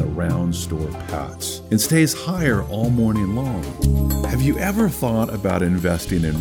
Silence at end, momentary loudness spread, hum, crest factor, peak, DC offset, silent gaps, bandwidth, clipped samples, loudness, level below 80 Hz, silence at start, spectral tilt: 0 s; 9 LU; none; 16 dB; -4 dBFS; under 0.1%; none; over 20 kHz; under 0.1%; -21 LUFS; -30 dBFS; 0 s; -5.5 dB/octave